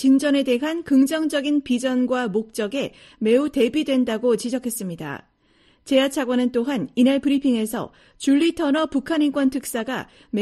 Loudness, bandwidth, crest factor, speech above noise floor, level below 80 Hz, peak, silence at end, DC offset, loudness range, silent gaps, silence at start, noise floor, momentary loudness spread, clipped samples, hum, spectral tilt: -21 LUFS; 13 kHz; 16 dB; 38 dB; -58 dBFS; -6 dBFS; 0 s; under 0.1%; 2 LU; none; 0 s; -59 dBFS; 10 LU; under 0.1%; none; -4.5 dB/octave